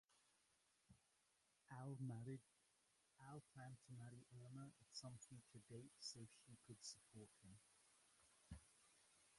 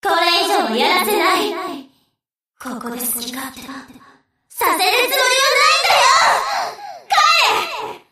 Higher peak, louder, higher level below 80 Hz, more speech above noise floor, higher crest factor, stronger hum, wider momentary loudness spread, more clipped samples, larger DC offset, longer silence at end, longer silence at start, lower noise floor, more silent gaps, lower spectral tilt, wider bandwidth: second, -40 dBFS vs -2 dBFS; second, -60 LUFS vs -14 LUFS; second, -80 dBFS vs -60 dBFS; second, 24 dB vs 58 dB; about the same, 20 dB vs 16 dB; neither; second, 12 LU vs 20 LU; neither; neither; second, 0 s vs 0.15 s; about the same, 0.1 s vs 0.05 s; first, -84 dBFS vs -75 dBFS; neither; first, -4.5 dB/octave vs -0.5 dB/octave; second, 11.5 kHz vs 15.5 kHz